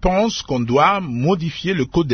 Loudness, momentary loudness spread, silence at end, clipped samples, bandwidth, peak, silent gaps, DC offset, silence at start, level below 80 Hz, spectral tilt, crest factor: -18 LUFS; 6 LU; 0 s; under 0.1%; 6.6 kHz; -2 dBFS; none; under 0.1%; 0 s; -36 dBFS; -6 dB/octave; 16 dB